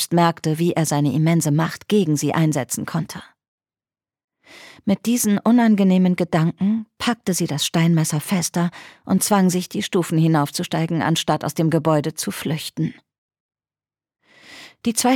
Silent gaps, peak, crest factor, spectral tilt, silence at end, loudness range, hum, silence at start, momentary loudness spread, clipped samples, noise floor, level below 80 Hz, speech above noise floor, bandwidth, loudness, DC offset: 3.48-3.58 s, 4.24-4.28 s, 13.18-13.29 s, 13.40-13.49 s; -4 dBFS; 16 dB; -5.5 dB/octave; 0 s; 6 LU; none; 0 s; 9 LU; under 0.1%; under -90 dBFS; -62 dBFS; over 71 dB; 17.5 kHz; -20 LUFS; under 0.1%